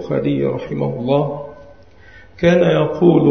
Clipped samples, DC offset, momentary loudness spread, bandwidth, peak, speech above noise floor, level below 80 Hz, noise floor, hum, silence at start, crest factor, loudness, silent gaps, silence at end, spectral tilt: under 0.1%; 0.5%; 11 LU; 6.4 kHz; 0 dBFS; 29 dB; -48 dBFS; -44 dBFS; none; 0 s; 16 dB; -17 LUFS; none; 0 s; -8.5 dB/octave